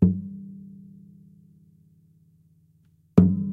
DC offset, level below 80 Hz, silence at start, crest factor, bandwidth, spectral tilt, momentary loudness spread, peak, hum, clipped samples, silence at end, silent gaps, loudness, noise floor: under 0.1%; -50 dBFS; 0 s; 24 dB; 2.8 kHz; -11.5 dB/octave; 26 LU; -2 dBFS; none; under 0.1%; 0 s; none; -22 LUFS; -61 dBFS